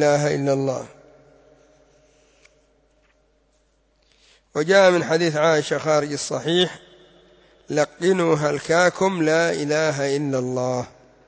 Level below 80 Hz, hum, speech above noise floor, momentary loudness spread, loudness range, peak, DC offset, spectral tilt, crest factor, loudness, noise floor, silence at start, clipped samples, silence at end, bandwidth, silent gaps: -62 dBFS; none; 43 dB; 10 LU; 8 LU; -6 dBFS; under 0.1%; -4.5 dB/octave; 18 dB; -20 LUFS; -63 dBFS; 0 s; under 0.1%; 0.4 s; 8 kHz; none